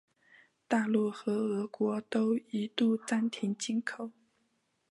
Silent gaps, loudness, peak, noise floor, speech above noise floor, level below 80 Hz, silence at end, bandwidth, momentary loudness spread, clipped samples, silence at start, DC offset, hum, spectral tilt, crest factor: none; -32 LUFS; -14 dBFS; -76 dBFS; 45 dB; -84 dBFS; 0.8 s; 11.5 kHz; 6 LU; under 0.1%; 0.7 s; under 0.1%; none; -5 dB/octave; 18 dB